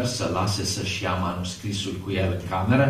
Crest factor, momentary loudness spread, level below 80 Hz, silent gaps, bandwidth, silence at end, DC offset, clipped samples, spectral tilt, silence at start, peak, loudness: 18 dB; 4 LU; -48 dBFS; none; 15 kHz; 0 s; under 0.1%; under 0.1%; -5 dB/octave; 0 s; -6 dBFS; -26 LUFS